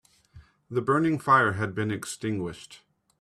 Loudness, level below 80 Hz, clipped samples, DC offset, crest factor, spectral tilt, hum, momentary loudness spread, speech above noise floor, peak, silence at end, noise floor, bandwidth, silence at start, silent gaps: -26 LUFS; -62 dBFS; under 0.1%; under 0.1%; 20 dB; -6 dB/octave; none; 12 LU; 28 dB; -8 dBFS; 0.45 s; -54 dBFS; 13.5 kHz; 0.35 s; none